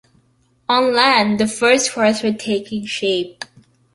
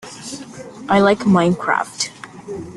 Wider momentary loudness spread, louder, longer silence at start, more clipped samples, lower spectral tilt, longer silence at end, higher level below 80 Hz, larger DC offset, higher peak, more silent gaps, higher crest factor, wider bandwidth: second, 16 LU vs 19 LU; about the same, -16 LUFS vs -17 LUFS; first, 0.7 s vs 0.05 s; neither; second, -3 dB/octave vs -5 dB/octave; first, 0.5 s vs 0 s; about the same, -58 dBFS vs -54 dBFS; neither; about the same, -2 dBFS vs -2 dBFS; neither; about the same, 18 dB vs 18 dB; about the same, 11.5 kHz vs 12 kHz